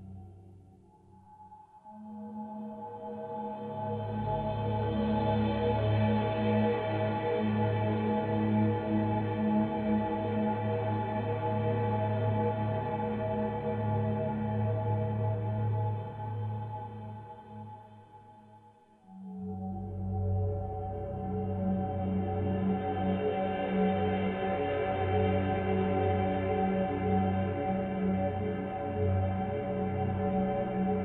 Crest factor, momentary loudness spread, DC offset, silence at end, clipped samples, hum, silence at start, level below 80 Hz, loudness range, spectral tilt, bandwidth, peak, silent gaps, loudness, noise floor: 14 dB; 12 LU; under 0.1%; 0 s; under 0.1%; none; 0 s; -52 dBFS; 10 LU; -10.5 dB/octave; 4.3 kHz; -16 dBFS; none; -32 LUFS; -59 dBFS